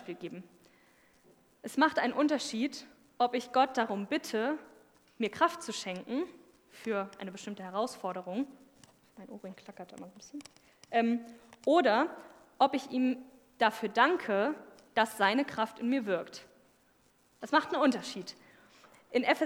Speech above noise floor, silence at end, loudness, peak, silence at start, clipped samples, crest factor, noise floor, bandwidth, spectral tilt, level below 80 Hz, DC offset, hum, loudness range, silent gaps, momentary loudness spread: 36 dB; 0 s; -32 LUFS; -10 dBFS; 0 s; under 0.1%; 24 dB; -68 dBFS; 19 kHz; -4 dB/octave; -80 dBFS; under 0.1%; none; 9 LU; none; 20 LU